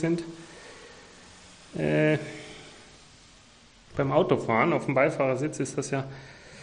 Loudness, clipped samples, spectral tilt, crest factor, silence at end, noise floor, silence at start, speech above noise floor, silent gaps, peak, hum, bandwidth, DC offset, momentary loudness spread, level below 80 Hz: -26 LUFS; under 0.1%; -6 dB/octave; 20 dB; 0 s; -55 dBFS; 0 s; 29 dB; none; -8 dBFS; none; 10 kHz; under 0.1%; 24 LU; -60 dBFS